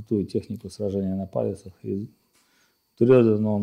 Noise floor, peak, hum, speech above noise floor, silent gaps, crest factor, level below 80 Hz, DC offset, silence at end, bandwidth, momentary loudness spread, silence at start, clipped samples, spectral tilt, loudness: -66 dBFS; -6 dBFS; none; 42 dB; none; 18 dB; -60 dBFS; under 0.1%; 0 s; 10.5 kHz; 17 LU; 0 s; under 0.1%; -9 dB/octave; -24 LUFS